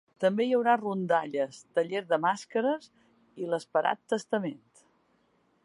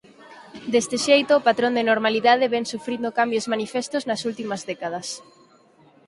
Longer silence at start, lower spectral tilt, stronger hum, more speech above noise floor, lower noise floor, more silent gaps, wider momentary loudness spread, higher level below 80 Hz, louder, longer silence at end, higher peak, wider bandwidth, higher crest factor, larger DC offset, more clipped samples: about the same, 0.2 s vs 0.25 s; first, -5.5 dB/octave vs -3 dB/octave; neither; first, 41 dB vs 33 dB; first, -69 dBFS vs -55 dBFS; neither; second, 8 LU vs 12 LU; second, -84 dBFS vs -68 dBFS; second, -29 LUFS vs -22 LUFS; first, 1.1 s vs 0.85 s; second, -10 dBFS vs -4 dBFS; about the same, 11.5 kHz vs 11.5 kHz; about the same, 20 dB vs 18 dB; neither; neither